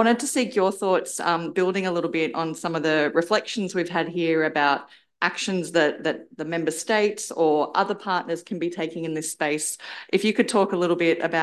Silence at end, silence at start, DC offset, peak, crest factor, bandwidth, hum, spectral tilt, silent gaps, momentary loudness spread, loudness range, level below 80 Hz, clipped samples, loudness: 0 s; 0 s; under 0.1%; -6 dBFS; 18 dB; 12.5 kHz; none; -4 dB/octave; none; 7 LU; 1 LU; -74 dBFS; under 0.1%; -24 LUFS